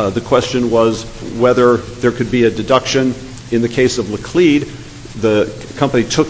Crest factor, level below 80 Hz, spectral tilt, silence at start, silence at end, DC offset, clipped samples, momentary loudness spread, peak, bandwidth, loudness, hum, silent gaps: 14 dB; -40 dBFS; -5.5 dB/octave; 0 s; 0 s; under 0.1%; under 0.1%; 10 LU; 0 dBFS; 8 kHz; -15 LUFS; none; none